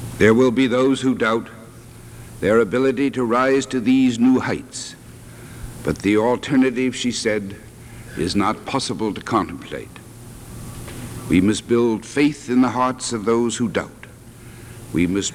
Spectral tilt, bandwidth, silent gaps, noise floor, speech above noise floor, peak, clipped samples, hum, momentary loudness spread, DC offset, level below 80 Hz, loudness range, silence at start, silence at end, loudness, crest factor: -5 dB/octave; 14.5 kHz; none; -41 dBFS; 22 dB; -2 dBFS; under 0.1%; none; 22 LU; under 0.1%; -46 dBFS; 5 LU; 0 s; 0 s; -19 LUFS; 18 dB